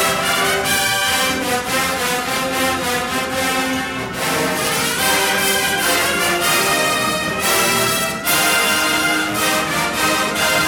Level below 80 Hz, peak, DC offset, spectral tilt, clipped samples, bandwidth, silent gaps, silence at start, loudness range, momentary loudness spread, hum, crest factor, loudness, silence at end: -46 dBFS; -4 dBFS; under 0.1%; -1.5 dB/octave; under 0.1%; over 20 kHz; none; 0 s; 3 LU; 5 LU; none; 14 dB; -16 LUFS; 0 s